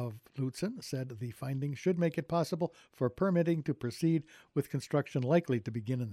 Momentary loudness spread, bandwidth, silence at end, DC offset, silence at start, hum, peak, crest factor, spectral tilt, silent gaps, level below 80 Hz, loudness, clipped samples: 9 LU; 14.5 kHz; 0 s; under 0.1%; 0 s; none; -16 dBFS; 16 dB; -7.5 dB/octave; none; -70 dBFS; -34 LUFS; under 0.1%